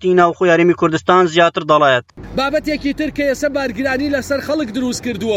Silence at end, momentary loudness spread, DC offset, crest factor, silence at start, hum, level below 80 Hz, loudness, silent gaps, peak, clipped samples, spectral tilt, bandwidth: 0 s; 8 LU; under 0.1%; 14 dB; 0 s; none; -42 dBFS; -15 LUFS; none; 0 dBFS; under 0.1%; -5 dB/octave; 16 kHz